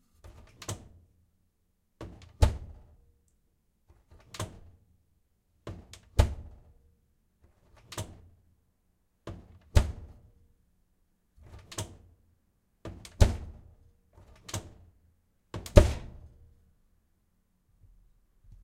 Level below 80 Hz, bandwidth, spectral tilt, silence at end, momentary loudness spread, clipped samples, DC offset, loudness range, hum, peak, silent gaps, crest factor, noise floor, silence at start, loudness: -36 dBFS; 15.5 kHz; -6 dB/octave; 2.55 s; 24 LU; under 0.1%; under 0.1%; 14 LU; none; 0 dBFS; none; 34 dB; -74 dBFS; 0.7 s; -31 LUFS